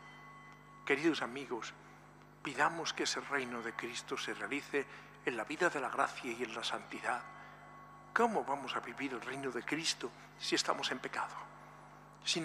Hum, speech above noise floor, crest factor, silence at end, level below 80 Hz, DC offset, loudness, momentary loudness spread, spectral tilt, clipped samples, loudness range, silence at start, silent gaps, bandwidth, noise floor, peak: 50 Hz at -65 dBFS; 21 dB; 26 dB; 0 s; -74 dBFS; under 0.1%; -37 LUFS; 21 LU; -2.5 dB/octave; under 0.1%; 2 LU; 0 s; none; 15 kHz; -59 dBFS; -14 dBFS